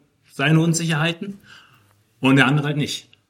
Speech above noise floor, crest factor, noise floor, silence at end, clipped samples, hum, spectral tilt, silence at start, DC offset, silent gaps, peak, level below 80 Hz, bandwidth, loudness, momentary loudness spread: 38 dB; 20 dB; -57 dBFS; 0.3 s; under 0.1%; none; -5 dB/octave; 0.4 s; under 0.1%; none; 0 dBFS; -62 dBFS; 15.5 kHz; -19 LUFS; 15 LU